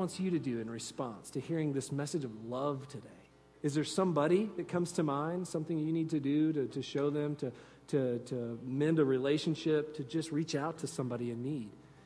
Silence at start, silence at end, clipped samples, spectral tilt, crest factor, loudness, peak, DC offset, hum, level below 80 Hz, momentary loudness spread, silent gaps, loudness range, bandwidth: 0 s; 0.05 s; under 0.1%; -6.5 dB/octave; 16 dB; -35 LUFS; -18 dBFS; under 0.1%; none; -72 dBFS; 10 LU; none; 4 LU; 11 kHz